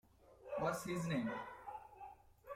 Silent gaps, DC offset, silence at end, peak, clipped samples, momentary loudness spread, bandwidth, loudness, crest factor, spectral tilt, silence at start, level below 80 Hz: none; under 0.1%; 0 s; -26 dBFS; under 0.1%; 17 LU; 16.5 kHz; -43 LUFS; 18 dB; -6 dB/octave; 0.2 s; -70 dBFS